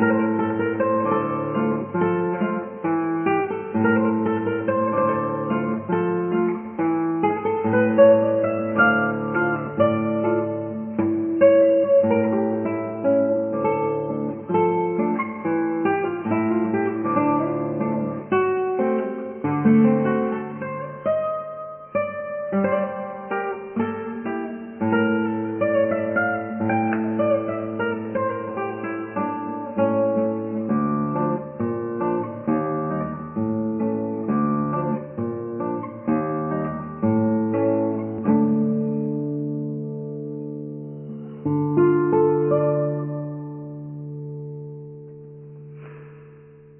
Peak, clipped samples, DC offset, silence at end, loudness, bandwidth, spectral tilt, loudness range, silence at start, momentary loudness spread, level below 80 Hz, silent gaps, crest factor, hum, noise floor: -4 dBFS; under 0.1%; under 0.1%; 0.2 s; -22 LUFS; 3.3 kHz; -12 dB/octave; 6 LU; 0 s; 12 LU; -60 dBFS; none; 18 dB; none; -46 dBFS